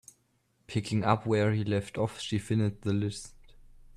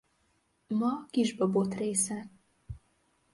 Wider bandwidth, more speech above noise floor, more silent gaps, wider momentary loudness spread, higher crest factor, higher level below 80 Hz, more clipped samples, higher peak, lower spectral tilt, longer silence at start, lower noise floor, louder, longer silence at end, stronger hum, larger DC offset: about the same, 11.5 kHz vs 11.5 kHz; about the same, 43 dB vs 43 dB; neither; second, 9 LU vs 20 LU; about the same, 20 dB vs 18 dB; about the same, -58 dBFS vs -60 dBFS; neither; first, -10 dBFS vs -16 dBFS; first, -6.5 dB/octave vs -5 dB/octave; about the same, 0.7 s vs 0.7 s; about the same, -72 dBFS vs -73 dBFS; about the same, -30 LUFS vs -30 LUFS; about the same, 0.65 s vs 0.55 s; neither; neither